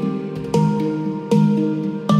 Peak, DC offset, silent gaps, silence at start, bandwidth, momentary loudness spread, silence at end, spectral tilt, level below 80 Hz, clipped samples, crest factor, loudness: -4 dBFS; under 0.1%; none; 0 s; 11.5 kHz; 8 LU; 0 s; -8 dB/octave; -54 dBFS; under 0.1%; 14 dB; -20 LUFS